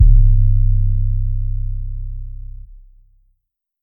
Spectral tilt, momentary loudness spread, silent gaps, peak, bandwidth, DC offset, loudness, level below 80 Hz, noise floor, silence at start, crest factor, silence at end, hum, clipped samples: -14.5 dB/octave; 21 LU; none; 0 dBFS; 0.3 kHz; under 0.1%; -19 LUFS; -16 dBFS; -71 dBFS; 0 s; 14 dB; 1.45 s; none; under 0.1%